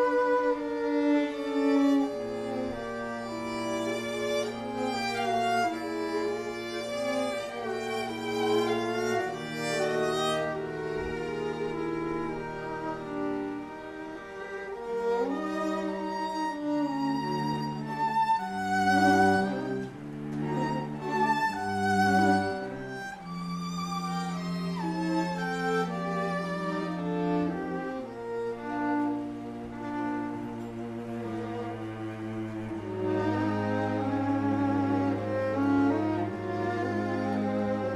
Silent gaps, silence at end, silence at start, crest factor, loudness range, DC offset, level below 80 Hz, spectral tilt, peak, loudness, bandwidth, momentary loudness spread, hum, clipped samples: none; 0 s; 0 s; 18 dB; 6 LU; under 0.1%; -60 dBFS; -6 dB/octave; -12 dBFS; -30 LUFS; 15 kHz; 11 LU; none; under 0.1%